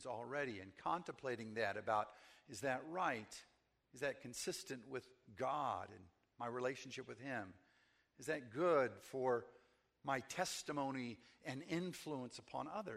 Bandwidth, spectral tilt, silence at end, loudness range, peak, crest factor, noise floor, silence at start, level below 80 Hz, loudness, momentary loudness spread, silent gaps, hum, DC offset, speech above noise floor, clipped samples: 15 kHz; -4 dB/octave; 0 s; 5 LU; -24 dBFS; 20 dB; -76 dBFS; 0 s; -80 dBFS; -44 LUFS; 12 LU; none; none; under 0.1%; 32 dB; under 0.1%